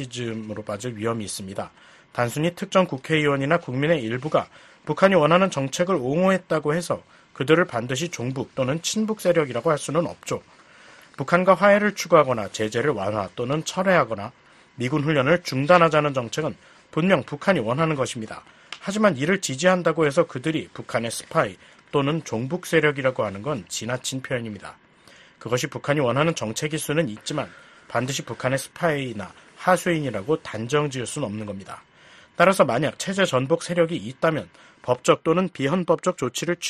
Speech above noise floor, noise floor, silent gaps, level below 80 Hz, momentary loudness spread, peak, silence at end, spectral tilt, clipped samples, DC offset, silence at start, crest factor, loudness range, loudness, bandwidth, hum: 29 dB; -52 dBFS; none; -60 dBFS; 13 LU; -2 dBFS; 0 s; -5 dB/octave; under 0.1%; under 0.1%; 0 s; 22 dB; 5 LU; -23 LUFS; 13 kHz; none